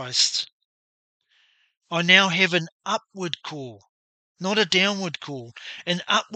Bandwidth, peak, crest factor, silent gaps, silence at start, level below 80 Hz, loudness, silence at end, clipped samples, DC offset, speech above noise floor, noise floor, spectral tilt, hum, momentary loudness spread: 8.8 kHz; 0 dBFS; 24 dB; 0.53-1.20 s, 2.72-2.80 s, 3.89-4.35 s; 0 s; -76 dBFS; -21 LUFS; 0 s; under 0.1%; under 0.1%; 40 dB; -64 dBFS; -2.5 dB/octave; none; 20 LU